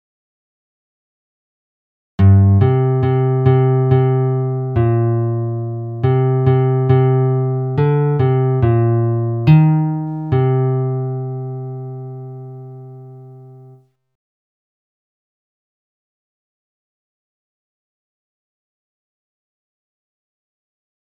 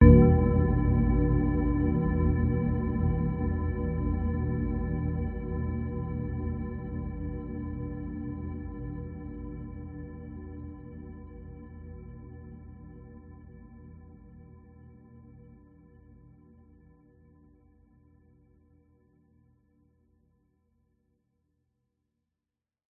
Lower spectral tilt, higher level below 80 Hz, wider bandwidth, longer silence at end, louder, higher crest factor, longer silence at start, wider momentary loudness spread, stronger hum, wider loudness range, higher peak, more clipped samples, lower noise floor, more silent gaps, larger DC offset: second, -12 dB/octave vs -13.5 dB/octave; second, -46 dBFS vs -34 dBFS; first, 3.9 kHz vs 3.2 kHz; second, 7.65 s vs 7.8 s; first, -15 LUFS vs -29 LUFS; second, 18 dB vs 24 dB; first, 2.2 s vs 0 s; second, 17 LU vs 23 LU; neither; second, 12 LU vs 24 LU; first, 0 dBFS vs -6 dBFS; neither; second, -46 dBFS vs -90 dBFS; neither; neither